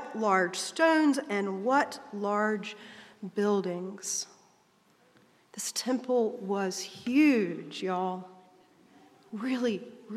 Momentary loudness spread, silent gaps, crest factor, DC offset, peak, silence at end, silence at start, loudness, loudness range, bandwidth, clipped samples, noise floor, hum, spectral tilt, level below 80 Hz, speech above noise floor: 14 LU; none; 20 dB; under 0.1%; -10 dBFS; 0 s; 0 s; -29 LUFS; 5 LU; 14.5 kHz; under 0.1%; -65 dBFS; none; -4 dB/octave; -86 dBFS; 36 dB